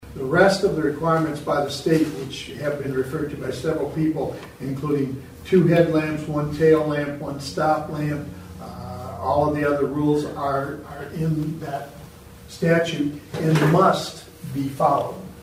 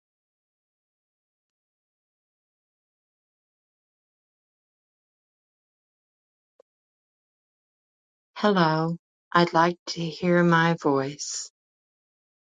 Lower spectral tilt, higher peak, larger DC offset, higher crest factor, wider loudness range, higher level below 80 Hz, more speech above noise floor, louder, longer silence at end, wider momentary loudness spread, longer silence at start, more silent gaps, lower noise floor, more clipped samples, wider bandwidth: about the same, -6.5 dB/octave vs -5.5 dB/octave; about the same, -2 dBFS vs -4 dBFS; neither; about the same, 20 dB vs 24 dB; about the same, 4 LU vs 6 LU; first, -48 dBFS vs -74 dBFS; second, 21 dB vs over 67 dB; about the same, -22 LUFS vs -24 LUFS; second, 0 s vs 1.1 s; first, 15 LU vs 12 LU; second, 0 s vs 8.35 s; second, none vs 8.99-9.31 s, 9.79-9.86 s; second, -42 dBFS vs under -90 dBFS; neither; first, 16 kHz vs 9.4 kHz